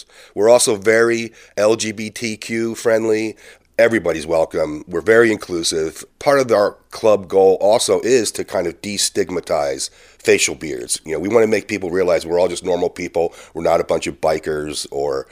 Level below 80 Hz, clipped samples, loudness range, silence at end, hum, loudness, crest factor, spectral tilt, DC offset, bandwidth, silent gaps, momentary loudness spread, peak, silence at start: -50 dBFS; under 0.1%; 3 LU; 0.1 s; none; -18 LUFS; 18 dB; -3.5 dB/octave; under 0.1%; 16 kHz; none; 10 LU; 0 dBFS; 0.35 s